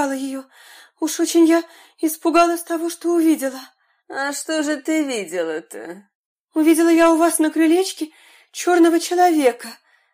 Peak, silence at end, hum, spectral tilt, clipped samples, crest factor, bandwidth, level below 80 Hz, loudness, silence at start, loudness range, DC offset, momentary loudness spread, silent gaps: -4 dBFS; 0.4 s; none; -2 dB/octave; under 0.1%; 14 dB; 15.5 kHz; -64 dBFS; -18 LUFS; 0 s; 6 LU; under 0.1%; 17 LU; 6.15-6.47 s